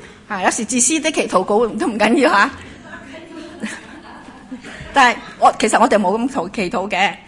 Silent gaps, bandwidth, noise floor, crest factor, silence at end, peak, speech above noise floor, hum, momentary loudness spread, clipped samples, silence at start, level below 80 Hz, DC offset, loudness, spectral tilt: none; 11 kHz; -38 dBFS; 18 dB; 0.05 s; 0 dBFS; 22 dB; none; 21 LU; under 0.1%; 0 s; -50 dBFS; under 0.1%; -16 LUFS; -3 dB/octave